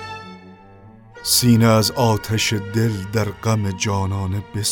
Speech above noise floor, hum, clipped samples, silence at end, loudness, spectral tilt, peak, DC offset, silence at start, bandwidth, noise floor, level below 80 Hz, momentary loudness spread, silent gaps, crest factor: 26 dB; none; under 0.1%; 0 s; -19 LUFS; -4.5 dB/octave; -2 dBFS; under 0.1%; 0 s; 19 kHz; -44 dBFS; -48 dBFS; 12 LU; none; 18 dB